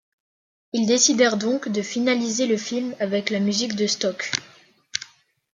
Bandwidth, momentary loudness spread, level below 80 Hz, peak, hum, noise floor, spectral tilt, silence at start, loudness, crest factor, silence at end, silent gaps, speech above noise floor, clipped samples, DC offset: 10 kHz; 13 LU; -70 dBFS; 0 dBFS; none; -56 dBFS; -3 dB/octave; 0.75 s; -22 LUFS; 22 dB; 0.5 s; none; 34 dB; under 0.1%; under 0.1%